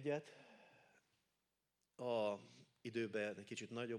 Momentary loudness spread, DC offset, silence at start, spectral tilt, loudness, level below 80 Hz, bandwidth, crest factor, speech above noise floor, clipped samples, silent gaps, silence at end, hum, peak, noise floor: 23 LU; under 0.1%; 0 s; -5 dB/octave; -45 LUFS; under -90 dBFS; 12.5 kHz; 18 dB; 44 dB; under 0.1%; none; 0 s; none; -30 dBFS; -89 dBFS